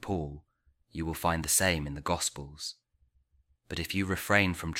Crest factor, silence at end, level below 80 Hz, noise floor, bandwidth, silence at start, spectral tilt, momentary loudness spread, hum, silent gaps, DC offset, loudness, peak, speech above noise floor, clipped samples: 24 dB; 0 s; -50 dBFS; -70 dBFS; 16.5 kHz; 0 s; -3.5 dB/octave; 15 LU; none; none; under 0.1%; -30 LUFS; -8 dBFS; 39 dB; under 0.1%